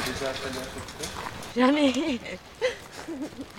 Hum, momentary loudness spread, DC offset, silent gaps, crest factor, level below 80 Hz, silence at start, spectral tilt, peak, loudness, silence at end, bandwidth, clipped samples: none; 15 LU; under 0.1%; none; 22 dB; -52 dBFS; 0 s; -4 dB/octave; -8 dBFS; -28 LUFS; 0 s; 17 kHz; under 0.1%